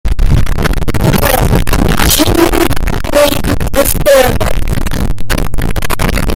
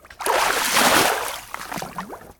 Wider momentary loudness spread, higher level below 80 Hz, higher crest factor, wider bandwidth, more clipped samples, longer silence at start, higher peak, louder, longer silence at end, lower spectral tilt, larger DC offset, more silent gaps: second, 9 LU vs 16 LU; first, -14 dBFS vs -52 dBFS; second, 8 dB vs 20 dB; second, 17 kHz vs 19.5 kHz; first, 0.3% vs under 0.1%; about the same, 0.05 s vs 0.1 s; about the same, 0 dBFS vs -2 dBFS; first, -12 LUFS vs -18 LUFS; about the same, 0 s vs 0.1 s; first, -4.5 dB/octave vs -1 dB/octave; neither; neither